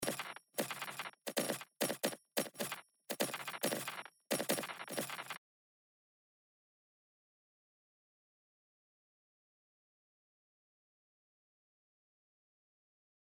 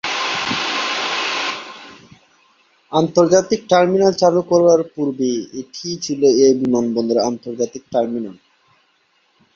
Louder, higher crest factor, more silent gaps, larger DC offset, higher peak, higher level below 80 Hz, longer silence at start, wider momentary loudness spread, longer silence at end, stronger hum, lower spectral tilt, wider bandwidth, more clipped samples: second, -40 LUFS vs -17 LUFS; first, 24 dB vs 16 dB; neither; neither; second, -20 dBFS vs -2 dBFS; second, under -90 dBFS vs -60 dBFS; about the same, 0 s vs 0.05 s; second, 8 LU vs 13 LU; first, 8.05 s vs 1.25 s; neither; second, -2.5 dB/octave vs -4.5 dB/octave; first, over 20 kHz vs 7.6 kHz; neither